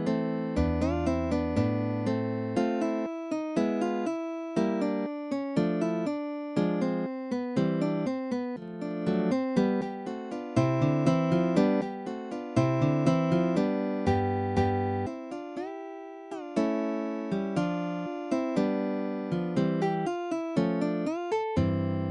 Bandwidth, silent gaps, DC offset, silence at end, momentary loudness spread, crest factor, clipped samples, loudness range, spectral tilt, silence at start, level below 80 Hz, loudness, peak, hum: 11 kHz; none; under 0.1%; 0 s; 9 LU; 18 dB; under 0.1%; 4 LU; -8 dB/octave; 0 s; -50 dBFS; -29 LUFS; -10 dBFS; none